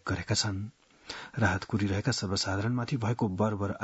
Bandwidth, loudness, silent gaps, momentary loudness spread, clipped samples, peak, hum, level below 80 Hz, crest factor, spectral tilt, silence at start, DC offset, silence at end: 8 kHz; -30 LUFS; none; 10 LU; under 0.1%; -12 dBFS; none; -60 dBFS; 20 dB; -5 dB/octave; 0.05 s; under 0.1%; 0 s